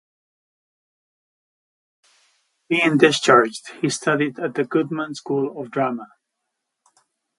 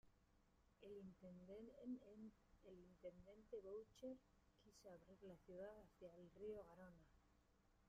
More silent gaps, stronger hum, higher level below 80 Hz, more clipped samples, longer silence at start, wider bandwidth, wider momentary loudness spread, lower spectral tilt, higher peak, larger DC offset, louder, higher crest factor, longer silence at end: neither; neither; first, -72 dBFS vs -80 dBFS; neither; first, 2.7 s vs 0.05 s; first, 11.5 kHz vs 7.4 kHz; about the same, 11 LU vs 10 LU; second, -4.5 dB/octave vs -7 dB/octave; first, 0 dBFS vs -44 dBFS; neither; first, -20 LUFS vs -61 LUFS; first, 22 dB vs 16 dB; first, 1.35 s vs 0 s